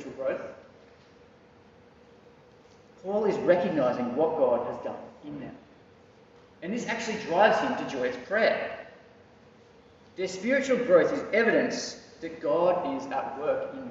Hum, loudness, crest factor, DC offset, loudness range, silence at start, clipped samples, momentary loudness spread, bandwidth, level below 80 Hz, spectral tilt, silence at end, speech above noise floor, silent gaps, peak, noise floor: none; -27 LUFS; 20 dB; under 0.1%; 6 LU; 0 s; under 0.1%; 19 LU; 8 kHz; -68 dBFS; -3.5 dB/octave; 0 s; 29 dB; none; -8 dBFS; -56 dBFS